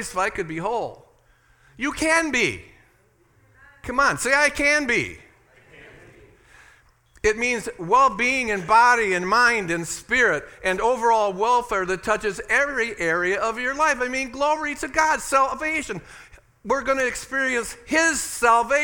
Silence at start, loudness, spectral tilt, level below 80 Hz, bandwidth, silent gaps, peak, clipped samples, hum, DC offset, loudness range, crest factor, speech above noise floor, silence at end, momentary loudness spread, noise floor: 0 s; -21 LUFS; -3 dB/octave; -48 dBFS; 18 kHz; none; -4 dBFS; under 0.1%; none; under 0.1%; 6 LU; 20 dB; 38 dB; 0 s; 9 LU; -60 dBFS